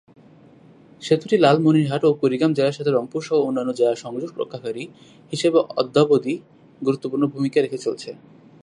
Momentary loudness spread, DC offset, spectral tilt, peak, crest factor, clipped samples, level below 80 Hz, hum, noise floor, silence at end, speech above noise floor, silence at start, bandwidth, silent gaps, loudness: 14 LU; under 0.1%; -6.5 dB/octave; -2 dBFS; 18 dB; under 0.1%; -68 dBFS; none; -49 dBFS; 0.5 s; 29 dB; 1 s; 11 kHz; none; -21 LUFS